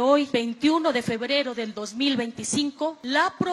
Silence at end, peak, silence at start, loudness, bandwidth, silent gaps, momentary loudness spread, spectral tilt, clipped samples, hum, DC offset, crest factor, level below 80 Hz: 0 s; -6 dBFS; 0 s; -25 LUFS; 12.5 kHz; none; 8 LU; -3.5 dB/octave; under 0.1%; none; under 0.1%; 18 dB; -66 dBFS